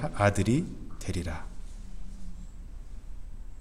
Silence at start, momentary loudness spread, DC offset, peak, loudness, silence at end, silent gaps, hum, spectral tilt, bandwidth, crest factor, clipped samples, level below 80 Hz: 0 s; 22 LU; under 0.1%; -10 dBFS; -30 LUFS; 0 s; none; none; -6 dB/octave; 14 kHz; 22 dB; under 0.1%; -42 dBFS